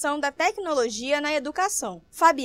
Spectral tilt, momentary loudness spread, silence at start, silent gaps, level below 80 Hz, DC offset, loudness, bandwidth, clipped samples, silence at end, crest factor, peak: -1.5 dB/octave; 5 LU; 0 s; none; -62 dBFS; under 0.1%; -25 LUFS; 16 kHz; under 0.1%; 0 s; 18 dB; -6 dBFS